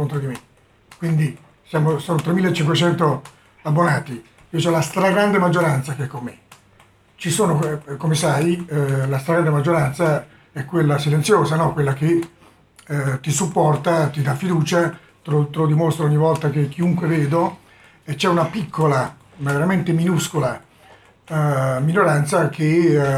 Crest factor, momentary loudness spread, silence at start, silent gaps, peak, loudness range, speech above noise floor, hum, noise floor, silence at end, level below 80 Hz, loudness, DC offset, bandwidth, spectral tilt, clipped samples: 16 dB; 11 LU; 0 s; none; -2 dBFS; 2 LU; 35 dB; none; -53 dBFS; 0 s; -56 dBFS; -19 LUFS; under 0.1%; 15 kHz; -6 dB/octave; under 0.1%